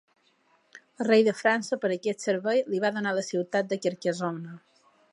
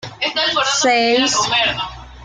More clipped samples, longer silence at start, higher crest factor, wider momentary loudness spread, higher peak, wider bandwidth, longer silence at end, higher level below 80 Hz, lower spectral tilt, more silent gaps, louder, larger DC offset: neither; first, 0.75 s vs 0 s; first, 20 dB vs 12 dB; about the same, 10 LU vs 8 LU; second, -8 dBFS vs -4 dBFS; first, 11.5 kHz vs 10 kHz; first, 0.55 s vs 0 s; second, -82 dBFS vs -46 dBFS; first, -5 dB/octave vs -1.5 dB/octave; neither; second, -27 LUFS vs -15 LUFS; neither